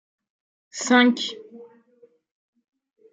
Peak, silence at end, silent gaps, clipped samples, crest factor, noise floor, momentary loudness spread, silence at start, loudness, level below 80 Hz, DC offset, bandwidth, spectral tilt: -4 dBFS; 1.5 s; none; under 0.1%; 22 dB; -58 dBFS; 22 LU; 0.75 s; -20 LUFS; -82 dBFS; under 0.1%; 9.2 kHz; -2.5 dB/octave